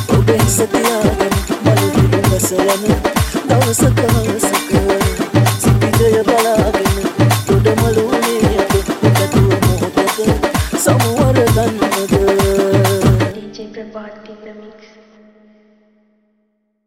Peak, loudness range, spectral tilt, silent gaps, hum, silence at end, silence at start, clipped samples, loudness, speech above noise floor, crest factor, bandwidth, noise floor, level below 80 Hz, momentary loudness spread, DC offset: 0 dBFS; 3 LU; -5.5 dB/octave; none; none; 2.15 s; 0 s; under 0.1%; -13 LUFS; 51 dB; 14 dB; 16.5 kHz; -64 dBFS; -28 dBFS; 4 LU; under 0.1%